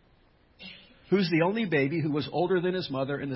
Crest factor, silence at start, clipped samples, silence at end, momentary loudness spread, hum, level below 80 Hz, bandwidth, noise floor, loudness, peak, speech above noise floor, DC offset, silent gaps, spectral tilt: 18 dB; 0.6 s; under 0.1%; 0 s; 20 LU; none; -64 dBFS; 5.8 kHz; -62 dBFS; -27 LUFS; -12 dBFS; 35 dB; under 0.1%; none; -10.5 dB/octave